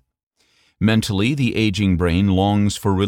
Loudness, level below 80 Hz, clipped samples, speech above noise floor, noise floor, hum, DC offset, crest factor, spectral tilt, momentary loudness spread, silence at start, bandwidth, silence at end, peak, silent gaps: -18 LUFS; -40 dBFS; under 0.1%; 44 dB; -61 dBFS; none; under 0.1%; 14 dB; -6 dB/octave; 2 LU; 0.8 s; 16.5 kHz; 0 s; -4 dBFS; none